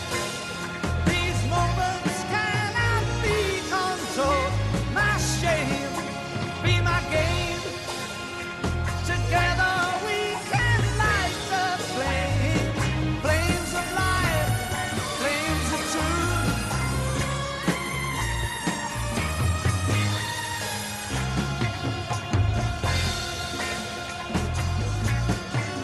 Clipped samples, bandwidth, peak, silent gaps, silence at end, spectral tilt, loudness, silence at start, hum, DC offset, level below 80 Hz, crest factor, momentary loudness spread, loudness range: under 0.1%; 12.5 kHz; -10 dBFS; none; 0 s; -4.5 dB/octave; -25 LUFS; 0 s; none; under 0.1%; -36 dBFS; 16 dB; 7 LU; 3 LU